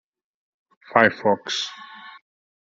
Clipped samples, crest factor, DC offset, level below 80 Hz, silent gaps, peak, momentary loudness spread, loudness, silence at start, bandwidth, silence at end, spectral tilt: under 0.1%; 24 dB; under 0.1%; -68 dBFS; none; -2 dBFS; 23 LU; -21 LUFS; 0.9 s; 7.8 kHz; 0.65 s; -3.5 dB/octave